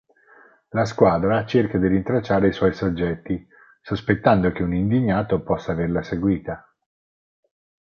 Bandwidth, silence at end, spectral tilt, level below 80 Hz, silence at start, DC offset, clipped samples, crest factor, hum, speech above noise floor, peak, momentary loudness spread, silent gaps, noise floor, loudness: 7.4 kHz; 1.25 s; -8 dB/octave; -42 dBFS; 0.75 s; under 0.1%; under 0.1%; 20 dB; none; 32 dB; -2 dBFS; 10 LU; none; -53 dBFS; -21 LUFS